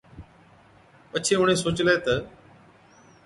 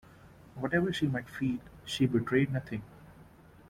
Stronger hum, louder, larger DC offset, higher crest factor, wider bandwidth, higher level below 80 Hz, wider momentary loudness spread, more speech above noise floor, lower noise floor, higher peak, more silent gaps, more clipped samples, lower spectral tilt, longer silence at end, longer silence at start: neither; first, -23 LUFS vs -32 LUFS; neither; about the same, 20 dB vs 18 dB; second, 11.5 kHz vs 15.5 kHz; first, -52 dBFS vs -60 dBFS; second, 10 LU vs 13 LU; first, 32 dB vs 25 dB; about the same, -55 dBFS vs -56 dBFS; first, -8 dBFS vs -14 dBFS; neither; neither; second, -4 dB/octave vs -6.5 dB/octave; first, 0.95 s vs 0.45 s; about the same, 0.15 s vs 0.25 s